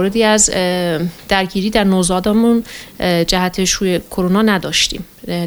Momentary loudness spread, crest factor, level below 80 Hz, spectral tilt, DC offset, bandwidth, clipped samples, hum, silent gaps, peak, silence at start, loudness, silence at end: 7 LU; 14 dB; -36 dBFS; -3.5 dB/octave; under 0.1%; over 20 kHz; under 0.1%; none; none; 0 dBFS; 0 s; -15 LUFS; 0 s